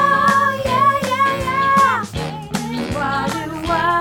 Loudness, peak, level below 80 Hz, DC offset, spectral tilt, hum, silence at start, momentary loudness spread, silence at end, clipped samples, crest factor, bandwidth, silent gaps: -17 LUFS; -2 dBFS; -40 dBFS; under 0.1%; -4.5 dB/octave; none; 0 s; 10 LU; 0 s; under 0.1%; 14 dB; 18.5 kHz; none